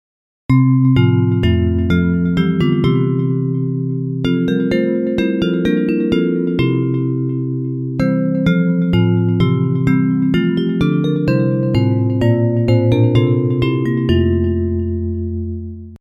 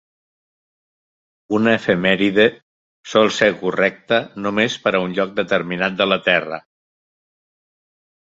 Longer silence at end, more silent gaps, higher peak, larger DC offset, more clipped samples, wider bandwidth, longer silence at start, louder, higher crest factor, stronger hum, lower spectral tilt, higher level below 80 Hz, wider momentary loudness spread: second, 0.05 s vs 1.7 s; second, none vs 2.62-3.03 s; about the same, 0 dBFS vs 0 dBFS; neither; neither; second, 7 kHz vs 8 kHz; second, 0.5 s vs 1.5 s; about the same, -16 LUFS vs -18 LUFS; second, 14 dB vs 20 dB; neither; first, -9.5 dB/octave vs -5 dB/octave; first, -34 dBFS vs -58 dBFS; about the same, 7 LU vs 6 LU